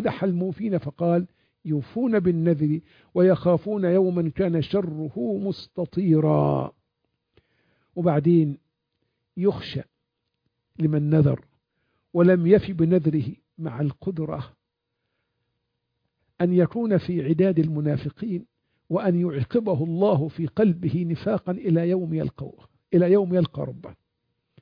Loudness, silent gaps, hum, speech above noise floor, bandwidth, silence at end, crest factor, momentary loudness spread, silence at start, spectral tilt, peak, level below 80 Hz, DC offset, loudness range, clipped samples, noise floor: -23 LUFS; none; none; 58 dB; 5.2 kHz; 0.7 s; 20 dB; 12 LU; 0 s; -11 dB/octave; -4 dBFS; -56 dBFS; under 0.1%; 4 LU; under 0.1%; -80 dBFS